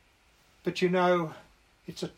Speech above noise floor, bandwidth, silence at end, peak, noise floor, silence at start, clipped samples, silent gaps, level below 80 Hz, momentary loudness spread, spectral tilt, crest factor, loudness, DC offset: 36 dB; 14 kHz; 0.1 s; -14 dBFS; -64 dBFS; 0.65 s; under 0.1%; none; -68 dBFS; 19 LU; -6 dB/octave; 18 dB; -29 LUFS; under 0.1%